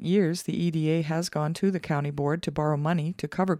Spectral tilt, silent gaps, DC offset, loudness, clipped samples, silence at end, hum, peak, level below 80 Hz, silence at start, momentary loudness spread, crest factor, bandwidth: -6.5 dB/octave; none; under 0.1%; -27 LUFS; under 0.1%; 0 s; none; -12 dBFS; -60 dBFS; 0 s; 4 LU; 14 dB; 15 kHz